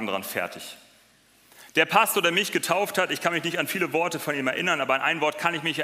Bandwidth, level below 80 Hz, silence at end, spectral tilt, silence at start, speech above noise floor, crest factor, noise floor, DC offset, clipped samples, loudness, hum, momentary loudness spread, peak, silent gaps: 16 kHz; -74 dBFS; 0 s; -3 dB/octave; 0 s; 34 dB; 22 dB; -59 dBFS; under 0.1%; under 0.1%; -24 LUFS; none; 9 LU; -4 dBFS; none